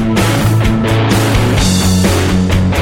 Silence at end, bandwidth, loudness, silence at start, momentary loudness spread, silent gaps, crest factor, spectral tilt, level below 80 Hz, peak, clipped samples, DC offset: 0 s; 17 kHz; -11 LUFS; 0 s; 1 LU; none; 10 dB; -5.5 dB/octave; -22 dBFS; 0 dBFS; under 0.1%; under 0.1%